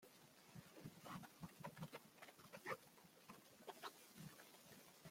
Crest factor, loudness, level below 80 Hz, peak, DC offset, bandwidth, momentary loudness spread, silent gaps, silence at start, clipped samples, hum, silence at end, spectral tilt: 22 dB; -59 LUFS; -86 dBFS; -36 dBFS; under 0.1%; 16.5 kHz; 10 LU; none; 0 s; under 0.1%; none; 0 s; -4 dB/octave